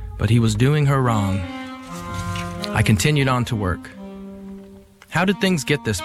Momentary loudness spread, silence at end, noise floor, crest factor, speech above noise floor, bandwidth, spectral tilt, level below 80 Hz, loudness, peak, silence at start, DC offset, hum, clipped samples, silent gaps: 19 LU; 0 s; -44 dBFS; 16 dB; 26 dB; 15.5 kHz; -5.5 dB/octave; -40 dBFS; -20 LUFS; -6 dBFS; 0 s; under 0.1%; none; under 0.1%; none